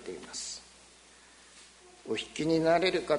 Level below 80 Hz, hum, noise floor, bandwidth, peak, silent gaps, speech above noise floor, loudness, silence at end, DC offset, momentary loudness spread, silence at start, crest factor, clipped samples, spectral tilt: -64 dBFS; 60 Hz at -65 dBFS; -57 dBFS; 10.5 kHz; -12 dBFS; none; 29 dB; -30 LUFS; 0 s; under 0.1%; 26 LU; 0 s; 20 dB; under 0.1%; -4 dB/octave